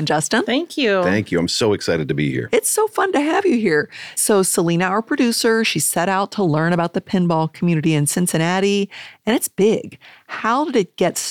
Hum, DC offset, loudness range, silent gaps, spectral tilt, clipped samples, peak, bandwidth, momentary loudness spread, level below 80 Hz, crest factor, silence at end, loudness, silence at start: none; under 0.1%; 2 LU; none; -4.5 dB/octave; under 0.1%; -4 dBFS; 18 kHz; 4 LU; -56 dBFS; 14 dB; 0 s; -18 LUFS; 0 s